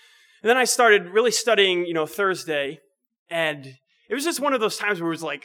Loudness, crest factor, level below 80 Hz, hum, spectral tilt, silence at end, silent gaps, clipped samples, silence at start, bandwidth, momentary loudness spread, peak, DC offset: -21 LUFS; 18 dB; -78 dBFS; none; -2.5 dB/octave; 0.05 s; 3.18-3.26 s; under 0.1%; 0.45 s; 19.5 kHz; 10 LU; -4 dBFS; under 0.1%